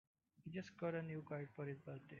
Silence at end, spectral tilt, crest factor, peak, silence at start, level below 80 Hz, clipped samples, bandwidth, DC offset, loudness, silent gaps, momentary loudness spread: 0 s; -7 dB/octave; 18 dB; -32 dBFS; 0.4 s; -84 dBFS; under 0.1%; 7.2 kHz; under 0.1%; -49 LUFS; none; 9 LU